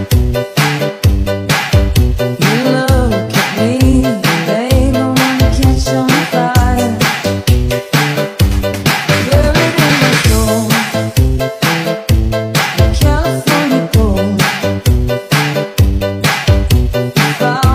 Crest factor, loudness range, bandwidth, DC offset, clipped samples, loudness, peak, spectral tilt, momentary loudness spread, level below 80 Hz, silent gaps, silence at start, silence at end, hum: 12 dB; 1 LU; 16 kHz; under 0.1%; under 0.1%; -12 LUFS; 0 dBFS; -5 dB/octave; 4 LU; -18 dBFS; none; 0 s; 0 s; none